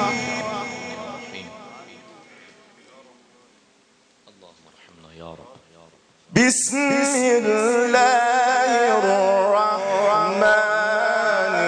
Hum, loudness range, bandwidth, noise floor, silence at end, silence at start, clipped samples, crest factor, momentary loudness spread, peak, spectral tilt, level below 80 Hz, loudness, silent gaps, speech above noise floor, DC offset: none; 17 LU; 10.5 kHz; -58 dBFS; 0 s; 0 s; under 0.1%; 16 dB; 18 LU; -6 dBFS; -3 dB/octave; -62 dBFS; -18 LUFS; none; 39 dB; under 0.1%